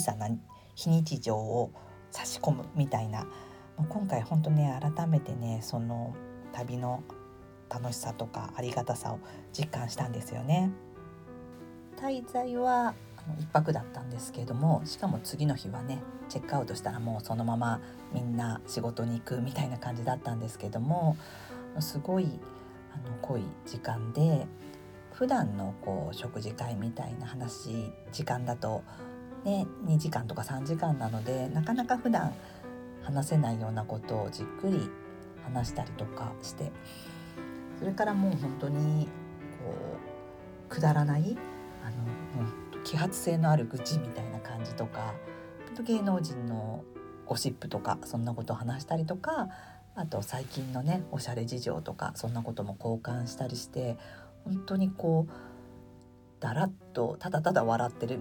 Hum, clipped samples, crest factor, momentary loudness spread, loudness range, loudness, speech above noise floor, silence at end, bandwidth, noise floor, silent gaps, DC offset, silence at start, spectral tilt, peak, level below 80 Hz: none; under 0.1%; 24 dB; 16 LU; 5 LU; -33 LUFS; 23 dB; 0 s; 19 kHz; -55 dBFS; none; under 0.1%; 0 s; -6.5 dB/octave; -10 dBFS; -60 dBFS